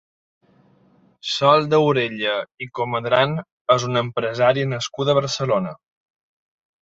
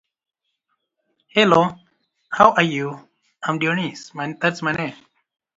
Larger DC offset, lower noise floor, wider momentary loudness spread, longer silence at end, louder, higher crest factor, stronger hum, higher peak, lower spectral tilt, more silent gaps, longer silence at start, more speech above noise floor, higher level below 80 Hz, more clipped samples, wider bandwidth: neither; second, -57 dBFS vs -74 dBFS; second, 10 LU vs 15 LU; first, 1.1 s vs 0.65 s; about the same, -20 LUFS vs -20 LUFS; about the same, 20 dB vs 22 dB; neither; about the same, -2 dBFS vs 0 dBFS; about the same, -5 dB/octave vs -5.5 dB/octave; first, 2.54-2.58 s, 3.52-3.65 s vs none; about the same, 1.25 s vs 1.35 s; second, 37 dB vs 55 dB; about the same, -62 dBFS vs -60 dBFS; neither; about the same, 7.8 kHz vs 7.8 kHz